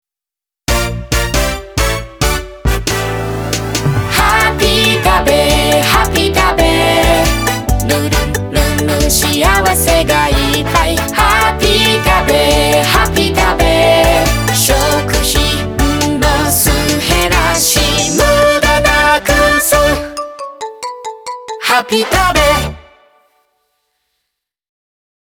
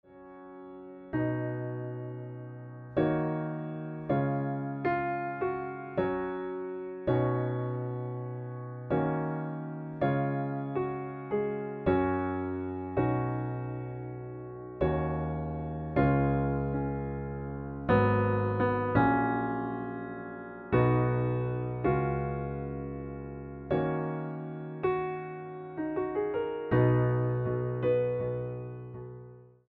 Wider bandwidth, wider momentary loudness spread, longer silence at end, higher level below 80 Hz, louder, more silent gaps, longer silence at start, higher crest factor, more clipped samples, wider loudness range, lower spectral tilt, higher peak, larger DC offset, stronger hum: first, over 20 kHz vs 4.5 kHz; second, 8 LU vs 14 LU; first, 2.45 s vs 0.2 s; first, -20 dBFS vs -50 dBFS; first, -11 LUFS vs -32 LUFS; neither; first, 0.7 s vs 0.1 s; second, 12 dB vs 20 dB; neither; about the same, 5 LU vs 5 LU; second, -3.5 dB/octave vs -8.5 dB/octave; first, 0 dBFS vs -12 dBFS; neither; neither